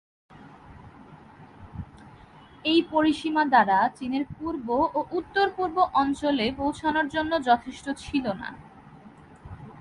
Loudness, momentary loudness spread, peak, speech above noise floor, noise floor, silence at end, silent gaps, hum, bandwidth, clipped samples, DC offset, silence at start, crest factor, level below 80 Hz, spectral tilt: -25 LUFS; 20 LU; -6 dBFS; 25 dB; -50 dBFS; 0 s; none; none; 11 kHz; under 0.1%; under 0.1%; 0.35 s; 20 dB; -54 dBFS; -5 dB/octave